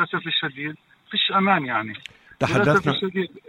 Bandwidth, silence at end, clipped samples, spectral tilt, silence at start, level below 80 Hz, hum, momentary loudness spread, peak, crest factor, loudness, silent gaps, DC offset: 16.5 kHz; 0.1 s; under 0.1%; -5.5 dB/octave; 0 s; -58 dBFS; none; 15 LU; -4 dBFS; 20 dB; -22 LUFS; none; under 0.1%